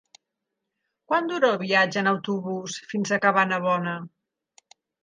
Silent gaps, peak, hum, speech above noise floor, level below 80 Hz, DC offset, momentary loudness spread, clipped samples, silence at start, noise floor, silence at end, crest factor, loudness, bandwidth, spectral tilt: none; -6 dBFS; none; 59 dB; -76 dBFS; under 0.1%; 11 LU; under 0.1%; 1.1 s; -83 dBFS; 0.95 s; 20 dB; -24 LUFS; 9.6 kHz; -4.5 dB/octave